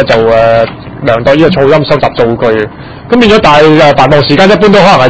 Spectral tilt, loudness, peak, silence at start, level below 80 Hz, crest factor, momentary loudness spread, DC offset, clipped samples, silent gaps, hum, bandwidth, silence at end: -6 dB/octave; -6 LUFS; 0 dBFS; 0 s; -30 dBFS; 6 dB; 9 LU; 3%; 10%; none; none; 8 kHz; 0 s